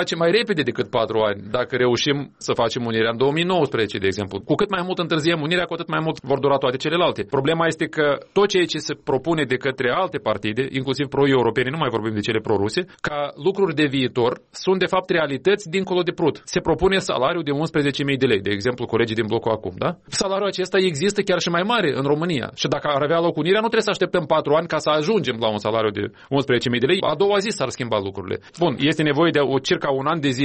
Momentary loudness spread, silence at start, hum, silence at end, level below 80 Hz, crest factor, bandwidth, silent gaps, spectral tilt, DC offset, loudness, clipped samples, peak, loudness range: 5 LU; 0 s; none; 0 s; -52 dBFS; 14 dB; 8.8 kHz; none; -5 dB/octave; under 0.1%; -21 LUFS; under 0.1%; -6 dBFS; 2 LU